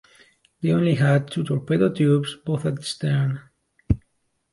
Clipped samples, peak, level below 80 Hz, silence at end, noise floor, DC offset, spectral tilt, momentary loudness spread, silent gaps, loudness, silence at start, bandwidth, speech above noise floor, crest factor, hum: under 0.1%; -6 dBFS; -42 dBFS; 0.55 s; -70 dBFS; under 0.1%; -7 dB/octave; 8 LU; none; -23 LUFS; 0.6 s; 11.5 kHz; 49 dB; 16 dB; none